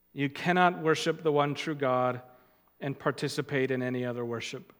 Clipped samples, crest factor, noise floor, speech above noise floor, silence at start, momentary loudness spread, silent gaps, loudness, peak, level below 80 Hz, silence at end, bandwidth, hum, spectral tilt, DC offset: under 0.1%; 22 dB; -61 dBFS; 32 dB; 0.15 s; 10 LU; none; -29 LUFS; -8 dBFS; -78 dBFS; 0.15 s; 18 kHz; none; -5.5 dB/octave; under 0.1%